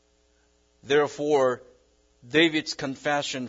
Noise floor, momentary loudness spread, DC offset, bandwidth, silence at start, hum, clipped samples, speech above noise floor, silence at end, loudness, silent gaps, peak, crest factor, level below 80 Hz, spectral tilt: -65 dBFS; 9 LU; under 0.1%; 7.8 kHz; 0.85 s; none; under 0.1%; 40 dB; 0 s; -25 LUFS; none; -8 dBFS; 18 dB; -66 dBFS; -4 dB/octave